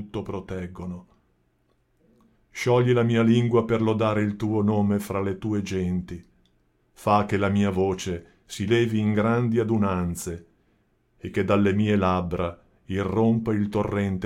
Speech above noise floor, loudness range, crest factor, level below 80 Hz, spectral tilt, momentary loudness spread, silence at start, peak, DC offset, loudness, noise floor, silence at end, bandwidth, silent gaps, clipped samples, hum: 44 dB; 4 LU; 18 dB; -52 dBFS; -7 dB/octave; 14 LU; 0 s; -6 dBFS; under 0.1%; -24 LUFS; -67 dBFS; 0 s; 15.5 kHz; none; under 0.1%; none